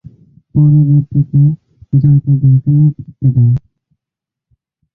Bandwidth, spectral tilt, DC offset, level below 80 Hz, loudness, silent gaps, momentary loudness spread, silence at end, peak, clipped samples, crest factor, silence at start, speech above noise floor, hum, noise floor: 1 kHz; -15 dB/octave; under 0.1%; -42 dBFS; -12 LUFS; none; 7 LU; 1.35 s; -2 dBFS; under 0.1%; 10 dB; 0.55 s; 74 dB; none; -84 dBFS